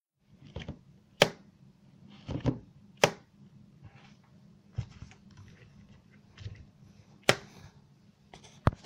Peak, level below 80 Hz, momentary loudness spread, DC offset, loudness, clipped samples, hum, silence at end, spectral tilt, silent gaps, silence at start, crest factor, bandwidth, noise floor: -4 dBFS; -54 dBFS; 27 LU; under 0.1%; -32 LUFS; under 0.1%; none; 0.1 s; -4 dB/octave; none; 0.55 s; 34 dB; 16 kHz; -61 dBFS